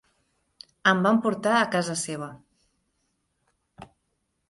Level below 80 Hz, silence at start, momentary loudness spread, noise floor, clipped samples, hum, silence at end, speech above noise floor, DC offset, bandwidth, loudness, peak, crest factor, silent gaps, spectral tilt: -68 dBFS; 0.85 s; 12 LU; -76 dBFS; under 0.1%; none; 0.65 s; 52 dB; under 0.1%; 11.5 kHz; -24 LUFS; -6 dBFS; 22 dB; none; -4.5 dB/octave